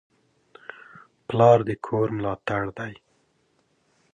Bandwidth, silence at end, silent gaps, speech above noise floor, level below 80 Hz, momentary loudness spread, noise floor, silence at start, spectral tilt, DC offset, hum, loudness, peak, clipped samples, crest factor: 8.6 kHz; 1.2 s; none; 45 dB; -58 dBFS; 26 LU; -67 dBFS; 1.3 s; -8 dB/octave; under 0.1%; none; -23 LUFS; -4 dBFS; under 0.1%; 22 dB